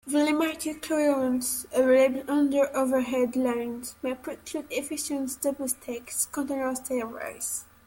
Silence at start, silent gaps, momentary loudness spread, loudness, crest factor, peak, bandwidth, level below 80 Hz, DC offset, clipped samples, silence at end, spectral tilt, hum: 0.05 s; none; 10 LU; -27 LUFS; 16 dB; -10 dBFS; 17 kHz; -62 dBFS; under 0.1%; under 0.1%; 0.2 s; -2.5 dB/octave; none